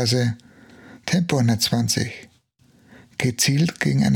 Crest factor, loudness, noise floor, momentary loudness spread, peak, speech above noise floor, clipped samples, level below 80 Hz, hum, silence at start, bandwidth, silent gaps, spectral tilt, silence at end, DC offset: 18 dB; -21 LUFS; -58 dBFS; 15 LU; -4 dBFS; 38 dB; under 0.1%; -54 dBFS; none; 0 s; 19 kHz; none; -4.5 dB/octave; 0 s; under 0.1%